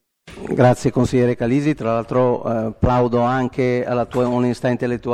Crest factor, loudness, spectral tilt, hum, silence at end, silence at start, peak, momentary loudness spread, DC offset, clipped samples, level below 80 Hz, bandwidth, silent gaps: 18 dB; -19 LUFS; -7.5 dB/octave; none; 0 s; 0.25 s; 0 dBFS; 5 LU; under 0.1%; under 0.1%; -40 dBFS; 12 kHz; none